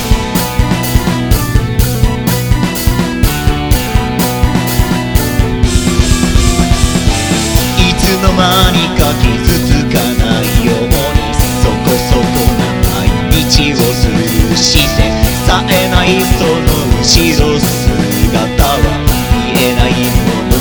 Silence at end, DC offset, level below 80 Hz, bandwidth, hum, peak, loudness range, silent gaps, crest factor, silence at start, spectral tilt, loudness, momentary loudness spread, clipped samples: 0 s; 0.3%; -16 dBFS; over 20 kHz; none; 0 dBFS; 3 LU; none; 10 dB; 0 s; -4.5 dB/octave; -11 LUFS; 4 LU; 2%